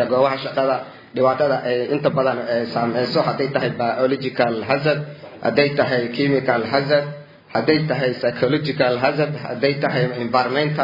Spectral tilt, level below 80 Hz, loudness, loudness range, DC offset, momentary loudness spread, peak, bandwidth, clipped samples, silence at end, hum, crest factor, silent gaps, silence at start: -8 dB/octave; -62 dBFS; -20 LUFS; 1 LU; under 0.1%; 4 LU; -2 dBFS; 5.4 kHz; under 0.1%; 0 s; none; 18 dB; none; 0 s